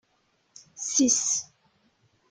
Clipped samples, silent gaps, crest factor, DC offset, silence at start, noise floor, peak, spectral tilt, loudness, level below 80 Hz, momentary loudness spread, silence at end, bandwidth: under 0.1%; none; 20 dB; under 0.1%; 0.75 s; -70 dBFS; -10 dBFS; -1 dB/octave; -24 LUFS; -74 dBFS; 15 LU; 0.85 s; 10.5 kHz